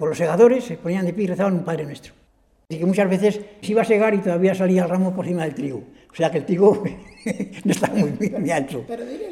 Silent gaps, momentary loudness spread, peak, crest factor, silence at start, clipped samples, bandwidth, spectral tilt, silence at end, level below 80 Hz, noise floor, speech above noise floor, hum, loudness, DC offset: none; 13 LU; -2 dBFS; 18 dB; 0 s; under 0.1%; 13.5 kHz; -7 dB/octave; 0 s; -58 dBFS; -50 dBFS; 29 dB; none; -21 LUFS; under 0.1%